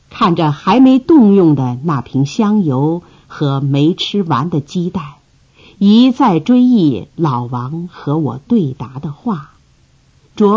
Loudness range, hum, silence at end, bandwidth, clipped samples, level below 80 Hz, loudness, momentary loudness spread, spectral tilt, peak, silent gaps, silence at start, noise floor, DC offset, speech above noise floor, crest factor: 6 LU; none; 0 s; 7.4 kHz; under 0.1%; -50 dBFS; -13 LUFS; 13 LU; -8 dB/octave; 0 dBFS; none; 0.1 s; -51 dBFS; under 0.1%; 38 dB; 12 dB